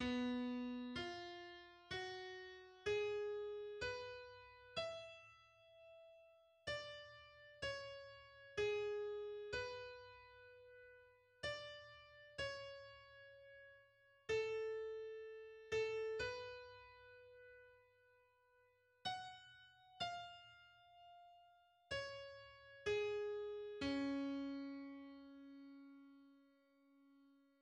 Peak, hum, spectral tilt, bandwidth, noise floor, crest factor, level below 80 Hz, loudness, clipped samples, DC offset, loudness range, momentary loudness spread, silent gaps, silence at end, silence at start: -30 dBFS; none; -4.5 dB/octave; 10 kHz; -76 dBFS; 18 dB; -74 dBFS; -47 LUFS; under 0.1%; under 0.1%; 7 LU; 21 LU; none; 0.25 s; 0 s